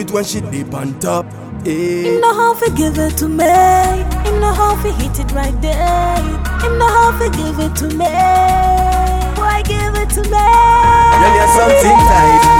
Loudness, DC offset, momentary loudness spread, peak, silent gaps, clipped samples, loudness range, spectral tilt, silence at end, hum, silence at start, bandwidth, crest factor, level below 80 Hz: -12 LUFS; under 0.1%; 10 LU; 0 dBFS; none; under 0.1%; 5 LU; -5 dB/octave; 0 s; none; 0 s; 19 kHz; 12 dB; -20 dBFS